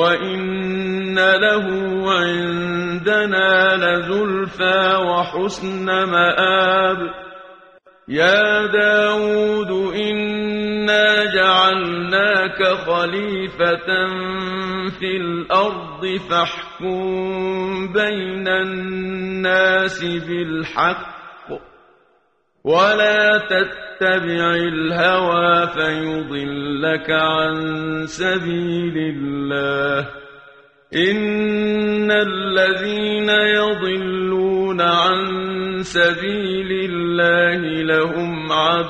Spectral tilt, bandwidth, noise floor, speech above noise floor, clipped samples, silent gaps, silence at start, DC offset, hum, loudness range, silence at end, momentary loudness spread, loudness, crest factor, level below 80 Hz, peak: -5 dB/octave; 9 kHz; -62 dBFS; 44 dB; under 0.1%; none; 0 s; under 0.1%; none; 5 LU; 0 s; 9 LU; -18 LUFS; 16 dB; -52 dBFS; -2 dBFS